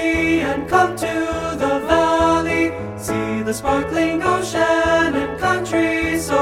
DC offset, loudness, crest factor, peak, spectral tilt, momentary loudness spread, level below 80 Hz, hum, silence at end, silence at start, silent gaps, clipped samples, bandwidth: under 0.1%; -18 LUFS; 16 dB; -2 dBFS; -5 dB/octave; 6 LU; -38 dBFS; none; 0 s; 0 s; none; under 0.1%; 16 kHz